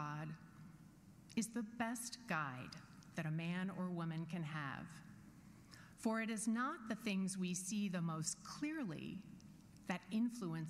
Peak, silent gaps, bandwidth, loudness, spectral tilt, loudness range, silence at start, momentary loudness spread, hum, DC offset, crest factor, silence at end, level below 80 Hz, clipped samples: -26 dBFS; none; 15.5 kHz; -44 LUFS; -5 dB/octave; 4 LU; 0 s; 19 LU; none; under 0.1%; 18 dB; 0 s; -76 dBFS; under 0.1%